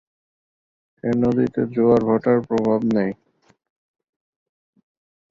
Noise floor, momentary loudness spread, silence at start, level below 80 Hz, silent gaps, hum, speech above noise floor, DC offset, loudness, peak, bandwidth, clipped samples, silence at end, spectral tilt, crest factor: under -90 dBFS; 9 LU; 1.05 s; -54 dBFS; none; none; over 71 dB; under 0.1%; -20 LUFS; -4 dBFS; 7.2 kHz; under 0.1%; 2.2 s; -9 dB/octave; 18 dB